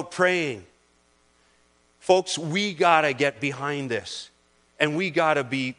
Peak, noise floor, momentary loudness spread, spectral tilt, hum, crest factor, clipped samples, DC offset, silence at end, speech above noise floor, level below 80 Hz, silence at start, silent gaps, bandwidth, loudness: -4 dBFS; -63 dBFS; 12 LU; -4 dB/octave; none; 22 dB; under 0.1%; under 0.1%; 0.05 s; 39 dB; -70 dBFS; 0 s; none; 10.5 kHz; -23 LUFS